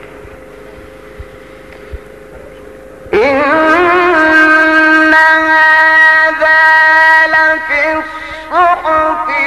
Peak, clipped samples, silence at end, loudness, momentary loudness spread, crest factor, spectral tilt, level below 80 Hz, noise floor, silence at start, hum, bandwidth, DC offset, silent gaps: 0 dBFS; 0.1%; 0 s; -7 LUFS; 8 LU; 10 dB; -4 dB/octave; -40 dBFS; -33 dBFS; 0 s; none; 13 kHz; 0.4%; none